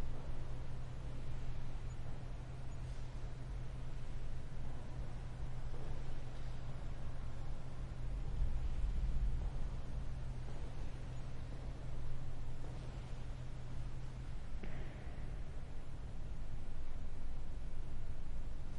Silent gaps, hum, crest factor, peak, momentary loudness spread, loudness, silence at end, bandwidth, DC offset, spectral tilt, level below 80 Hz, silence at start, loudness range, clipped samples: none; none; 12 dB; -26 dBFS; 7 LU; -48 LUFS; 0 s; 7 kHz; under 0.1%; -7 dB/octave; -42 dBFS; 0 s; 5 LU; under 0.1%